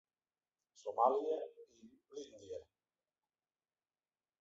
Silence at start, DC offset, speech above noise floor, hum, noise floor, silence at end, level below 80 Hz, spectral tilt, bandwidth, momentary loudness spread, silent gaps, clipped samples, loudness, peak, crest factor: 0.85 s; under 0.1%; over 51 dB; none; under -90 dBFS; 1.8 s; -86 dBFS; -4 dB/octave; 7.6 kHz; 19 LU; none; under 0.1%; -38 LUFS; -18 dBFS; 26 dB